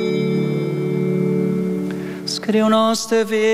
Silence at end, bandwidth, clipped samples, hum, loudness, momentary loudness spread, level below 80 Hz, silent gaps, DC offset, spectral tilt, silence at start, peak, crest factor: 0 s; 15 kHz; under 0.1%; none; -19 LUFS; 8 LU; -64 dBFS; none; under 0.1%; -5.5 dB/octave; 0 s; -6 dBFS; 12 dB